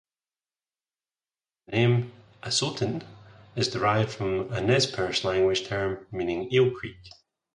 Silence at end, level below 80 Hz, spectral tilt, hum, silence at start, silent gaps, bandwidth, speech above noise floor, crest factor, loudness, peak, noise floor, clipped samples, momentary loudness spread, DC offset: 0.45 s; -56 dBFS; -5 dB/octave; none; 1.7 s; none; 11.5 kHz; over 64 dB; 20 dB; -26 LUFS; -8 dBFS; under -90 dBFS; under 0.1%; 13 LU; under 0.1%